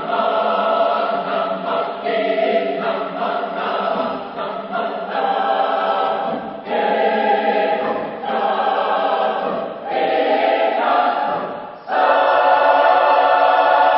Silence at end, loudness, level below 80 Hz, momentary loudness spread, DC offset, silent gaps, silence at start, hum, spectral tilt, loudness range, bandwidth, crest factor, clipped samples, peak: 0 s; -18 LUFS; -64 dBFS; 10 LU; under 0.1%; none; 0 s; none; -9 dB/octave; 5 LU; 5.8 kHz; 16 dB; under 0.1%; -2 dBFS